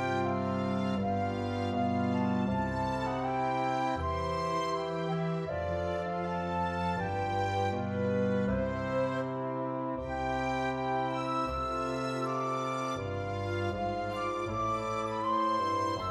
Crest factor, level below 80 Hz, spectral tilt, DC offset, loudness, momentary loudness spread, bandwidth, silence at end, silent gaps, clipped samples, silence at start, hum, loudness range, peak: 14 dB; -52 dBFS; -6.5 dB/octave; under 0.1%; -32 LUFS; 4 LU; 12.5 kHz; 0 s; none; under 0.1%; 0 s; none; 2 LU; -18 dBFS